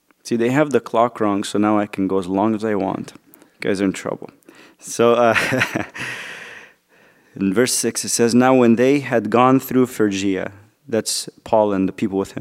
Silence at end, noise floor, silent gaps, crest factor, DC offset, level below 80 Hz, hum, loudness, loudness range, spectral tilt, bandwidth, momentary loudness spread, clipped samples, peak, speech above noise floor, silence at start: 0 s; -54 dBFS; none; 18 dB; under 0.1%; -62 dBFS; none; -18 LUFS; 5 LU; -4.5 dB/octave; 16 kHz; 13 LU; under 0.1%; 0 dBFS; 36 dB; 0.25 s